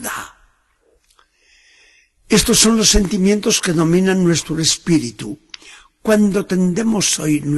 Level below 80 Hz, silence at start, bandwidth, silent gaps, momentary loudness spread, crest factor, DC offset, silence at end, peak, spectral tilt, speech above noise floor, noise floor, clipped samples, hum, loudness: -34 dBFS; 0 s; 12.5 kHz; none; 18 LU; 18 dB; under 0.1%; 0 s; 0 dBFS; -4 dB/octave; 44 dB; -59 dBFS; under 0.1%; none; -15 LUFS